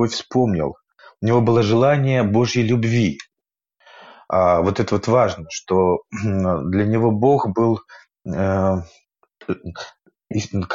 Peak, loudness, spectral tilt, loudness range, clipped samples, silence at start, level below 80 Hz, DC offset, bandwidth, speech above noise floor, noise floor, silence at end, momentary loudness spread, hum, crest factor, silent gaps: -4 dBFS; -19 LUFS; -7 dB/octave; 3 LU; under 0.1%; 0 s; -50 dBFS; under 0.1%; 7.8 kHz; 68 dB; -86 dBFS; 0 s; 13 LU; none; 14 dB; none